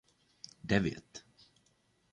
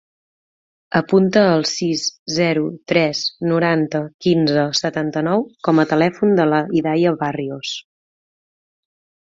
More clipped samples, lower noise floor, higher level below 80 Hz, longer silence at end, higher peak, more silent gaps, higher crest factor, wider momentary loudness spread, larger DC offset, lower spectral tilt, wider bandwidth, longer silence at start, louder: neither; second, -73 dBFS vs under -90 dBFS; about the same, -60 dBFS vs -60 dBFS; second, 0.95 s vs 1.45 s; second, -14 dBFS vs -2 dBFS; second, none vs 2.19-2.26 s, 4.14-4.19 s; first, 26 dB vs 16 dB; first, 21 LU vs 7 LU; neither; about the same, -6 dB/octave vs -5.5 dB/octave; first, 10 kHz vs 7.8 kHz; second, 0.65 s vs 0.9 s; second, -33 LUFS vs -18 LUFS